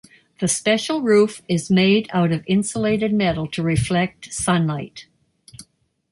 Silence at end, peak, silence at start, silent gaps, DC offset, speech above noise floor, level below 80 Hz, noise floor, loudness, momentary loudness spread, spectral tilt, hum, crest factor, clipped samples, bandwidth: 0.5 s; -6 dBFS; 0.4 s; none; under 0.1%; 37 dB; -46 dBFS; -56 dBFS; -20 LUFS; 8 LU; -5 dB/octave; none; 14 dB; under 0.1%; 11.5 kHz